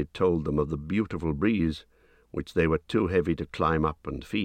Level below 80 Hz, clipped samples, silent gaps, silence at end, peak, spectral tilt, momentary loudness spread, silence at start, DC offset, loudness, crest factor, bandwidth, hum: -44 dBFS; under 0.1%; none; 0 s; -10 dBFS; -8 dB/octave; 8 LU; 0 s; under 0.1%; -28 LUFS; 16 dB; 9.8 kHz; none